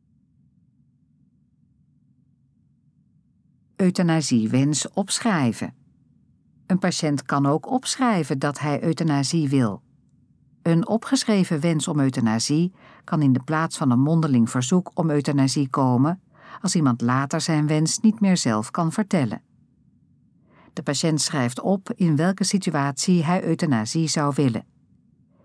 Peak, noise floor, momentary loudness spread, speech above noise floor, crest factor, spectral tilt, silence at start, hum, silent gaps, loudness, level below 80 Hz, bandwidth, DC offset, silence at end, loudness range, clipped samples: -6 dBFS; -62 dBFS; 5 LU; 41 dB; 16 dB; -5.5 dB/octave; 3.8 s; none; none; -22 LUFS; -70 dBFS; 11 kHz; under 0.1%; 0.85 s; 4 LU; under 0.1%